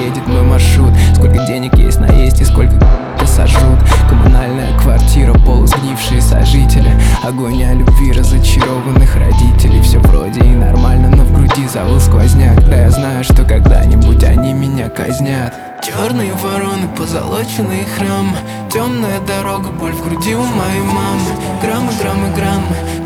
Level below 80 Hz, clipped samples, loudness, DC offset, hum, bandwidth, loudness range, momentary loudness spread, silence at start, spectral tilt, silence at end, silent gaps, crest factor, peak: -10 dBFS; under 0.1%; -11 LUFS; under 0.1%; none; 16 kHz; 7 LU; 8 LU; 0 s; -6 dB/octave; 0 s; none; 8 dB; 0 dBFS